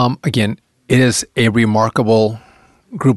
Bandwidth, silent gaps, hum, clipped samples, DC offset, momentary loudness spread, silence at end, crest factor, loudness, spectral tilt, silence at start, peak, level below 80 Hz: 12.5 kHz; none; none; under 0.1%; under 0.1%; 13 LU; 0 s; 14 dB; -15 LUFS; -5.5 dB/octave; 0 s; -2 dBFS; -46 dBFS